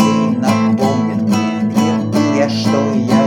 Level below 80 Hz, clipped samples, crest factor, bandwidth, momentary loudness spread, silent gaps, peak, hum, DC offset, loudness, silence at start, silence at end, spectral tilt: -56 dBFS; under 0.1%; 12 dB; 15 kHz; 2 LU; none; 0 dBFS; none; under 0.1%; -15 LUFS; 0 s; 0 s; -6 dB/octave